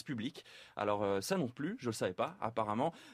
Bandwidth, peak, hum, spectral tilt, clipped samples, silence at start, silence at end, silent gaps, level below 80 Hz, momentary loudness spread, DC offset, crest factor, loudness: 15.5 kHz; -20 dBFS; none; -5.5 dB/octave; under 0.1%; 0.05 s; 0 s; none; -74 dBFS; 8 LU; under 0.1%; 18 dB; -37 LUFS